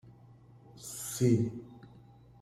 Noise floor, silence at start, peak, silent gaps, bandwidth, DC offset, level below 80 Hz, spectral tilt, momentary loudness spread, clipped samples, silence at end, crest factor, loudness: -57 dBFS; 0.05 s; -14 dBFS; none; 16 kHz; under 0.1%; -64 dBFS; -6.5 dB/octave; 23 LU; under 0.1%; 0.45 s; 20 dB; -32 LUFS